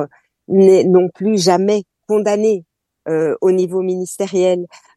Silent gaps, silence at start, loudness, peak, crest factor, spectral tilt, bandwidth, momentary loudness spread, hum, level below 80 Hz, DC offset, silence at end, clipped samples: none; 0 s; -15 LUFS; 0 dBFS; 14 dB; -6 dB/octave; 12.5 kHz; 11 LU; none; -66 dBFS; under 0.1%; 0.3 s; under 0.1%